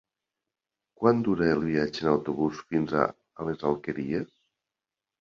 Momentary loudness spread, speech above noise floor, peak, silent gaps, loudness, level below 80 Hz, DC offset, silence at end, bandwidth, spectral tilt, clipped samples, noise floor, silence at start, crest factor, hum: 8 LU; 63 dB; -6 dBFS; none; -28 LUFS; -58 dBFS; under 0.1%; 0.95 s; 7.2 kHz; -7.5 dB/octave; under 0.1%; -90 dBFS; 1 s; 24 dB; none